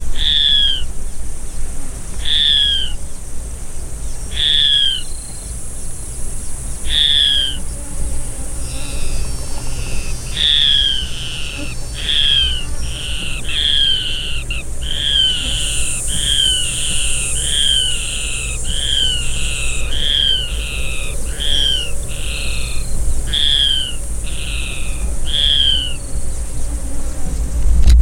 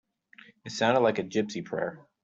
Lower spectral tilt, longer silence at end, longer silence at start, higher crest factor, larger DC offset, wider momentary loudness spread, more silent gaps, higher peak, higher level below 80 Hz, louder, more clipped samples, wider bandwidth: second, -1.5 dB/octave vs -5 dB/octave; second, 0 s vs 0.25 s; second, 0 s vs 0.65 s; about the same, 16 dB vs 20 dB; neither; about the same, 16 LU vs 14 LU; neither; first, 0 dBFS vs -10 dBFS; first, -22 dBFS vs -70 dBFS; first, -16 LUFS vs -28 LUFS; neither; first, 16.5 kHz vs 8 kHz